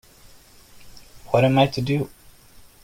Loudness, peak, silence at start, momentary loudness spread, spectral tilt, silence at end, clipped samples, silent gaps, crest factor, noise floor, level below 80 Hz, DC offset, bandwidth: -21 LUFS; -6 dBFS; 0.8 s; 9 LU; -7 dB/octave; 0.75 s; under 0.1%; none; 18 dB; -49 dBFS; -52 dBFS; under 0.1%; 16.5 kHz